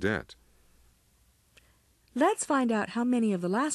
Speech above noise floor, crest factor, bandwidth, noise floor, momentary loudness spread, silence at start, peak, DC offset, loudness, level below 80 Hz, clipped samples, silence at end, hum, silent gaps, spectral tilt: 38 dB; 16 dB; 13 kHz; -66 dBFS; 9 LU; 0 s; -14 dBFS; under 0.1%; -28 LUFS; -62 dBFS; under 0.1%; 0 s; none; none; -5 dB/octave